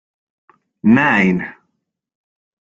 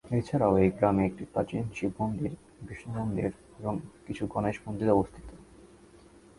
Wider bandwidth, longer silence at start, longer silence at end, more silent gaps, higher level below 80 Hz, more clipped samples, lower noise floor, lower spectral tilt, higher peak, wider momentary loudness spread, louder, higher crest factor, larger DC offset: second, 7.6 kHz vs 11.5 kHz; first, 0.85 s vs 0.05 s; first, 1.2 s vs 0.75 s; neither; about the same, -54 dBFS vs -52 dBFS; neither; first, -73 dBFS vs -55 dBFS; about the same, -7.5 dB/octave vs -8.5 dB/octave; first, -2 dBFS vs -10 dBFS; second, 12 LU vs 16 LU; first, -14 LUFS vs -30 LUFS; about the same, 18 dB vs 20 dB; neither